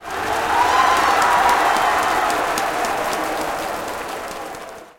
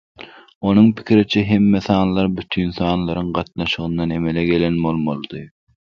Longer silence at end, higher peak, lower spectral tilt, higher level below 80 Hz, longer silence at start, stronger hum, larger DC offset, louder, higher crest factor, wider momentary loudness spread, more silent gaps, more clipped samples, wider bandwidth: second, 0.1 s vs 0.5 s; about the same, -2 dBFS vs 0 dBFS; second, -2 dB/octave vs -8 dB/octave; about the same, -46 dBFS vs -42 dBFS; second, 0 s vs 0.2 s; neither; neither; about the same, -18 LUFS vs -18 LUFS; about the same, 16 dB vs 18 dB; first, 13 LU vs 10 LU; second, none vs 0.55-0.61 s; neither; first, 17 kHz vs 6.8 kHz